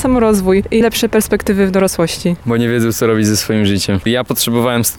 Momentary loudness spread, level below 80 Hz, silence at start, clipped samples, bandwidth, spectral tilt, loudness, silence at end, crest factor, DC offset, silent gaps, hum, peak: 4 LU; -34 dBFS; 0 s; under 0.1%; 19.5 kHz; -5 dB/octave; -14 LUFS; 0 s; 10 dB; 0.4%; none; none; -2 dBFS